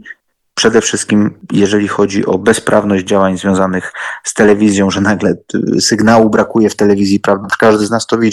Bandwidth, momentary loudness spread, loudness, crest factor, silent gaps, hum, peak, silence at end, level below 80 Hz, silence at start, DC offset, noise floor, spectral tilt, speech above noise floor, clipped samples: 12.5 kHz; 6 LU; -11 LUFS; 12 dB; none; none; 0 dBFS; 0 s; -46 dBFS; 0.05 s; under 0.1%; -37 dBFS; -4.5 dB/octave; 26 dB; under 0.1%